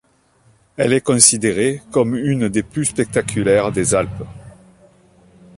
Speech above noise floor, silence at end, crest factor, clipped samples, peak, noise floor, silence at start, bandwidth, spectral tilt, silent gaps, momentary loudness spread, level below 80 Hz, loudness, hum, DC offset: 39 dB; 1.05 s; 18 dB; under 0.1%; 0 dBFS; -56 dBFS; 0.8 s; 16 kHz; -4 dB/octave; none; 11 LU; -46 dBFS; -16 LUFS; none; under 0.1%